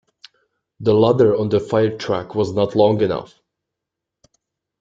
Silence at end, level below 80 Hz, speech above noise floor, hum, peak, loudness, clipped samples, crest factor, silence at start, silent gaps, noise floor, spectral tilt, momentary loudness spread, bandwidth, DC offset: 1.55 s; -54 dBFS; 66 dB; none; -2 dBFS; -18 LUFS; under 0.1%; 18 dB; 0.8 s; none; -83 dBFS; -7.5 dB/octave; 8 LU; 7.6 kHz; under 0.1%